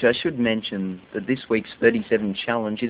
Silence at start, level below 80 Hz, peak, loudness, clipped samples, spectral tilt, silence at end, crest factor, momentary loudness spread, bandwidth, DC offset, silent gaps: 0 s; -58 dBFS; -2 dBFS; -23 LUFS; under 0.1%; -9.5 dB/octave; 0 s; 20 dB; 9 LU; 4 kHz; under 0.1%; none